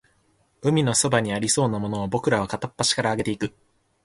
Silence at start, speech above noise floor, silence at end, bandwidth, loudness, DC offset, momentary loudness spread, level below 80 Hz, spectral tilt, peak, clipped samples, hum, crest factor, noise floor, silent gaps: 0.65 s; 41 dB; 0.55 s; 11.5 kHz; -23 LUFS; under 0.1%; 8 LU; -54 dBFS; -4 dB/octave; -4 dBFS; under 0.1%; none; 20 dB; -64 dBFS; none